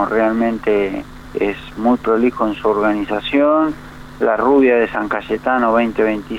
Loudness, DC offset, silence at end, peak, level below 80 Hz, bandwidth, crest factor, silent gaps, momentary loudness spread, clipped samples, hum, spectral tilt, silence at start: -16 LUFS; under 0.1%; 0 s; -4 dBFS; -42 dBFS; 12 kHz; 12 dB; none; 8 LU; under 0.1%; none; -7 dB/octave; 0 s